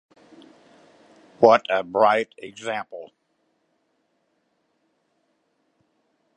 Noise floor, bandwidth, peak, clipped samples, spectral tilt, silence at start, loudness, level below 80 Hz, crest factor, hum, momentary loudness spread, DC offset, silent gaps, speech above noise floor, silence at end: -71 dBFS; 9.8 kHz; 0 dBFS; under 0.1%; -5 dB/octave; 1.4 s; -21 LUFS; -74 dBFS; 26 dB; none; 18 LU; under 0.1%; none; 50 dB; 3.3 s